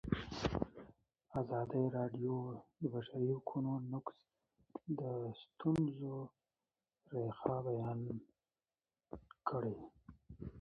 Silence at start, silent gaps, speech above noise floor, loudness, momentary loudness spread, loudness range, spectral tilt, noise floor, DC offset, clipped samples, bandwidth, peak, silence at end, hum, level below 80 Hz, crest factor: 0.05 s; none; over 49 dB; -42 LUFS; 15 LU; 4 LU; -7.5 dB/octave; under -90 dBFS; under 0.1%; under 0.1%; 6.6 kHz; -20 dBFS; 0 s; none; -62 dBFS; 22 dB